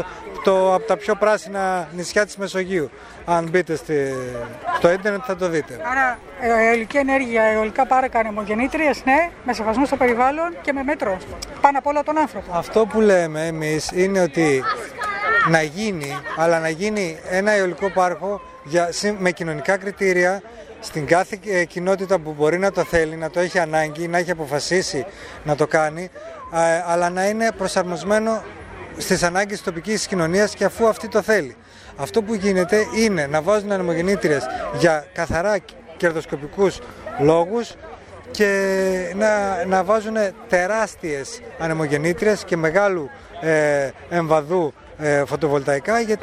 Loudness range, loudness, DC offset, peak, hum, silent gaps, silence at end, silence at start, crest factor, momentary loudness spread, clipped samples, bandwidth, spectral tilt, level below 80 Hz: 3 LU; -20 LUFS; under 0.1%; 0 dBFS; none; none; 0 s; 0 s; 20 dB; 9 LU; under 0.1%; 15.5 kHz; -5 dB/octave; -48 dBFS